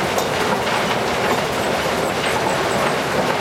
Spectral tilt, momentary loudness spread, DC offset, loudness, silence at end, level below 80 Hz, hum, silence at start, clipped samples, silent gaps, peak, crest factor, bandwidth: -3.5 dB/octave; 1 LU; under 0.1%; -19 LUFS; 0 s; -46 dBFS; none; 0 s; under 0.1%; none; -6 dBFS; 14 dB; 16.5 kHz